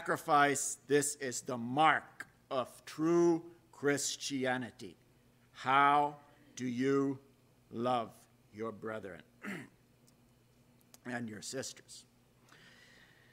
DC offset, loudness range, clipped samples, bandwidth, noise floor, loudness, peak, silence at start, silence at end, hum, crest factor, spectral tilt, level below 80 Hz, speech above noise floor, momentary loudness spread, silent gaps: under 0.1%; 14 LU; under 0.1%; 16 kHz; -67 dBFS; -34 LUFS; -12 dBFS; 0 s; 1.3 s; none; 24 dB; -4 dB/octave; -78 dBFS; 33 dB; 20 LU; none